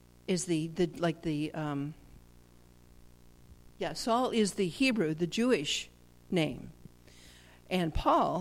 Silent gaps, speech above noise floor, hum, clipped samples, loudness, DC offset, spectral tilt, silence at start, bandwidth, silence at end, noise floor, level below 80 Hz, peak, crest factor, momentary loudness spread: none; 27 dB; 60 Hz at -60 dBFS; under 0.1%; -32 LUFS; under 0.1%; -5 dB/octave; 0.3 s; 16 kHz; 0 s; -58 dBFS; -52 dBFS; -14 dBFS; 18 dB; 10 LU